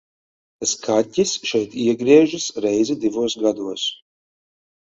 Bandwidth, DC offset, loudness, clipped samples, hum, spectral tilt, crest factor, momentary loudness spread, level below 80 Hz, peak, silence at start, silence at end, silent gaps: 8 kHz; under 0.1%; -20 LUFS; under 0.1%; none; -3.5 dB/octave; 20 dB; 10 LU; -62 dBFS; 0 dBFS; 0.6 s; 1 s; none